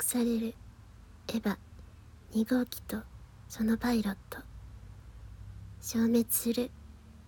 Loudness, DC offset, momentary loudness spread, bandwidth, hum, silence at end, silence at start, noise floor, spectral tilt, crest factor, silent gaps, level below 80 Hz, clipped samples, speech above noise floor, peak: -32 LUFS; under 0.1%; 24 LU; 18 kHz; none; 0 s; 0 s; -53 dBFS; -4.5 dB/octave; 18 dB; none; -52 dBFS; under 0.1%; 22 dB; -16 dBFS